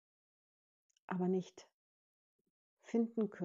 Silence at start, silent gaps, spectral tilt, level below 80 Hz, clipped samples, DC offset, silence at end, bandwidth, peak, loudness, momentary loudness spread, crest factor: 1.1 s; 1.74-2.77 s; -8 dB/octave; under -90 dBFS; under 0.1%; under 0.1%; 0 s; 7.6 kHz; -24 dBFS; -39 LUFS; 8 LU; 18 dB